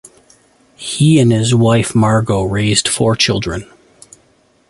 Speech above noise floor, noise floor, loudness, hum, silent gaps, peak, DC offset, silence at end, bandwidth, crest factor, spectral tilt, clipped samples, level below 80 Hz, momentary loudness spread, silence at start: 41 dB; -54 dBFS; -13 LUFS; none; none; 0 dBFS; under 0.1%; 1.05 s; 11.5 kHz; 14 dB; -5 dB/octave; under 0.1%; -40 dBFS; 13 LU; 0.8 s